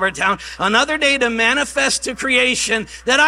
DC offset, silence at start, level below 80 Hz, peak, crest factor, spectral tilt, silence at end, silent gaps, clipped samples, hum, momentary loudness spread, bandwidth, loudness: under 0.1%; 0 s; -46 dBFS; 0 dBFS; 16 dB; -1.5 dB/octave; 0 s; none; under 0.1%; none; 5 LU; 15.5 kHz; -16 LUFS